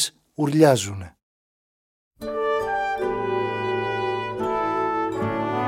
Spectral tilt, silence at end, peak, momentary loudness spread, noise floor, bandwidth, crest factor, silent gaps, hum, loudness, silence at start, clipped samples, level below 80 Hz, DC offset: -5 dB/octave; 0 s; -2 dBFS; 12 LU; under -90 dBFS; 16.5 kHz; 22 dB; 1.23-2.11 s; none; -23 LUFS; 0 s; under 0.1%; -54 dBFS; under 0.1%